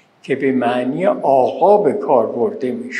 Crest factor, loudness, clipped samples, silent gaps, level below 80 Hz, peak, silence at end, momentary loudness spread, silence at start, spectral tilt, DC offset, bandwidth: 16 dB; -16 LUFS; under 0.1%; none; -74 dBFS; 0 dBFS; 0 s; 7 LU; 0.25 s; -7 dB/octave; under 0.1%; 10.5 kHz